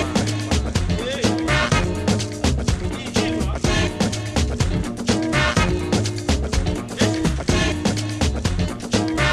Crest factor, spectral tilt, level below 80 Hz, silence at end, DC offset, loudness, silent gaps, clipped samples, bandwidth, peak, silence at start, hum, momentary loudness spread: 16 dB; -5 dB/octave; -28 dBFS; 0 s; under 0.1%; -21 LUFS; none; under 0.1%; 13.5 kHz; -4 dBFS; 0 s; none; 5 LU